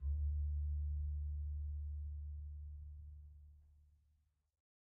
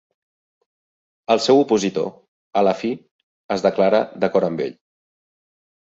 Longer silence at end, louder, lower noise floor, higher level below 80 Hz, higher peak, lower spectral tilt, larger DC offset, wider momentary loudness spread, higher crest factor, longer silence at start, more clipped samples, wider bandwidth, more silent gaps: about the same, 1.1 s vs 1.15 s; second, -45 LUFS vs -20 LUFS; second, -78 dBFS vs under -90 dBFS; first, -44 dBFS vs -64 dBFS; second, -34 dBFS vs -2 dBFS; first, -19.5 dB/octave vs -5 dB/octave; neither; first, 17 LU vs 13 LU; second, 10 dB vs 18 dB; second, 0 s vs 1.3 s; neither; second, 0.5 kHz vs 8 kHz; second, none vs 2.28-2.51 s, 3.11-3.49 s